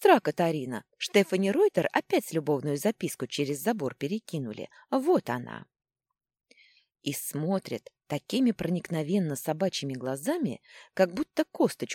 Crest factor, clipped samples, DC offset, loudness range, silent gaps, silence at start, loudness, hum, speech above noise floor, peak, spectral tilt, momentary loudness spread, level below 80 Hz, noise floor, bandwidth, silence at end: 20 dB; under 0.1%; under 0.1%; 6 LU; none; 0 s; -29 LUFS; none; 34 dB; -8 dBFS; -5.5 dB/octave; 12 LU; -70 dBFS; -63 dBFS; 17 kHz; 0 s